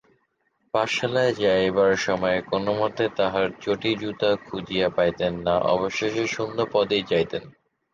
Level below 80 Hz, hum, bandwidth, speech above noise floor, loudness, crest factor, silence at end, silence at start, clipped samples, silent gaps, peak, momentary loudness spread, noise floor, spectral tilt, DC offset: -54 dBFS; none; 7.6 kHz; 47 dB; -24 LUFS; 16 dB; 0.45 s; 0.75 s; under 0.1%; none; -8 dBFS; 5 LU; -70 dBFS; -5 dB/octave; under 0.1%